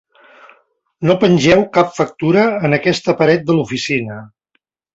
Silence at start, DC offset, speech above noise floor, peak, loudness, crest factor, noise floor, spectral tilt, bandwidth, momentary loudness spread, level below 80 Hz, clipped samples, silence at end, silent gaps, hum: 1 s; under 0.1%; 53 dB; 0 dBFS; -14 LUFS; 16 dB; -67 dBFS; -6 dB/octave; 8 kHz; 8 LU; -50 dBFS; under 0.1%; 0.7 s; none; none